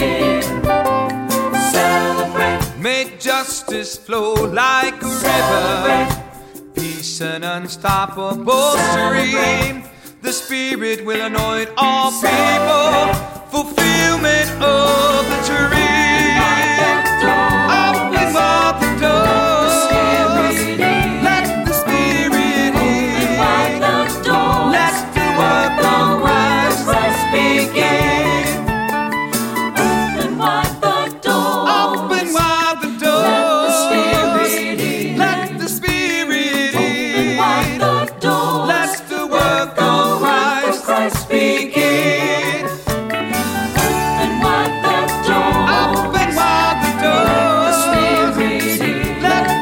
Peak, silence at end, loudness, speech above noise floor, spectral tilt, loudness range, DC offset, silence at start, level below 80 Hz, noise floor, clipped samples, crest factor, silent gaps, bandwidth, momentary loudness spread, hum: -2 dBFS; 0 s; -15 LUFS; 20 dB; -4 dB/octave; 4 LU; under 0.1%; 0 s; -36 dBFS; -36 dBFS; under 0.1%; 14 dB; none; 17 kHz; 6 LU; none